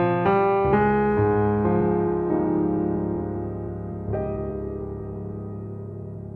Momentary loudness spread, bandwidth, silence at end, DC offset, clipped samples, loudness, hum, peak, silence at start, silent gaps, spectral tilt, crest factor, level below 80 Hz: 14 LU; 4.3 kHz; 0 s; under 0.1%; under 0.1%; -24 LUFS; none; -8 dBFS; 0 s; none; -11 dB/octave; 16 dB; -42 dBFS